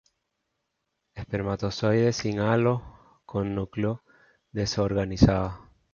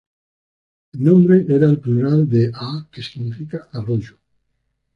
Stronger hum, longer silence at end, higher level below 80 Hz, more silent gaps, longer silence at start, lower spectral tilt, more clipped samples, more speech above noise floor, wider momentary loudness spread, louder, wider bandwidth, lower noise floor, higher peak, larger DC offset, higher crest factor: neither; second, 0.3 s vs 0.85 s; first, -44 dBFS vs -54 dBFS; neither; first, 1.15 s vs 0.95 s; second, -6.5 dB/octave vs -10 dB/octave; neither; about the same, 55 dB vs 55 dB; about the same, 15 LU vs 16 LU; second, -26 LUFS vs -16 LUFS; first, 7.2 kHz vs 6.2 kHz; first, -80 dBFS vs -71 dBFS; about the same, -4 dBFS vs -2 dBFS; neither; first, 22 dB vs 16 dB